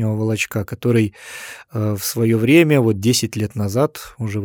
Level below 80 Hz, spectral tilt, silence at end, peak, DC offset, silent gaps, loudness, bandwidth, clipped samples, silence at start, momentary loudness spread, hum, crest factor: -56 dBFS; -5.5 dB/octave; 0 s; 0 dBFS; under 0.1%; none; -18 LUFS; 19 kHz; under 0.1%; 0 s; 15 LU; none; 18 dB